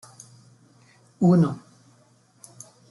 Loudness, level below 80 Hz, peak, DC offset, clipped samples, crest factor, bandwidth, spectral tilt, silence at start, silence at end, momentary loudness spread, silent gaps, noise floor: -21 LUFS; -68 dBFS; -8 dBFS; under 0.1%; under 0.1%; 18 dB; 11.5 kHz; -8.5 dB/octave; 1.2 s; 1.3 s; 28 LU; none; -59 dBFS